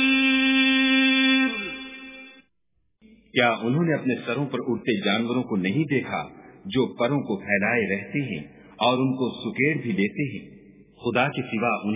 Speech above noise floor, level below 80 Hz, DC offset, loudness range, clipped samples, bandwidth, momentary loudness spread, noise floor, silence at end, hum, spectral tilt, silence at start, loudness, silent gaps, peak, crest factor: 49 dB; -62 dBFS; under 0.1%; 4 LU; under 0.1%; 3.9 kHz; 14 LU; -74 dBFS; 0 s; none; -9.5 dB/octave; 0 s; -23 LUFS; none; -6 dBFS; 20 dB